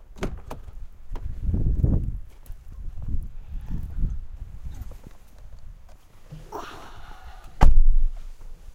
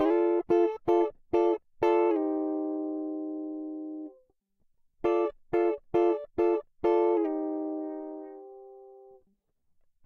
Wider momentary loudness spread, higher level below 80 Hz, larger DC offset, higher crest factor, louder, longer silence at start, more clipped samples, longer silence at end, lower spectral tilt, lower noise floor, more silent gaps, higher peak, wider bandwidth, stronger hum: first, 24 LU vs 15 LU; first, -24 dBFS vs -64 dBFS; neither; first, 22 dB vs 16 dB; about the same, -29 LUFS vs -29 LUFS; first, 0.15 s vs 0 s; neither; second, 0.05 s vs 1.1 s; about the same, -7.5 dB/octave vs -7.5 dB/octave; second, -45 dBFS vs -72 dBFS; neither; first, 0 dBFS vs -14 dBFS; second, 3.7 kHz vs 6 kHz; neither